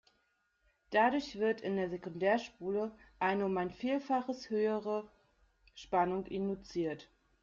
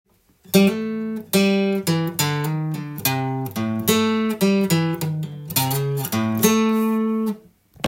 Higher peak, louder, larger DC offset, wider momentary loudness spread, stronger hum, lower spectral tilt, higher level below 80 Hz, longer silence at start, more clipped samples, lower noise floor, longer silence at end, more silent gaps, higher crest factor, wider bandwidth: second, -18 dBFS vs -2 dBFS; second, -35 LUFS vs -21 LUFS; neither; about the same, 8 LU vs 8 LU; neither; first, -6.5 dB/octave vs -5 dB/octave; second, -68 dBFS vs -62 dBFS; first, 0.9 s vs 0.5 s; neither; first, -77 dBFS vs -47 dBFS; first, 0.4 s vs 0 s; neither; about the same, 18 dB vs 20 dB; second, 7.6 kHz vs 17 kHz